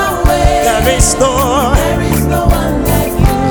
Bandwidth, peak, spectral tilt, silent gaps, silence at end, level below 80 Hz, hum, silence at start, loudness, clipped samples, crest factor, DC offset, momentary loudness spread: over 20 kHz; 0 dBFS; -5 dB/octave; none; 0 s; -16 dBFS; none; 0 s; -11 LUFS; 0.5%; 10 dB; under 0.1%; 3 LU